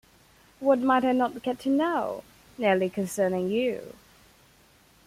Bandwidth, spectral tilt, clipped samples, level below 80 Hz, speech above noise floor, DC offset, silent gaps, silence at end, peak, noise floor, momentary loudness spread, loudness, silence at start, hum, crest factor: 16 kHz; -5.5 dB/octave; under 0.1%; -64 dBFS; 33 dB; under 0.1%; none; 1.15 s; -10 dBFS; -59 dBFS; 10 LU; -26 LUFS; 0.6 s; none; 18 dB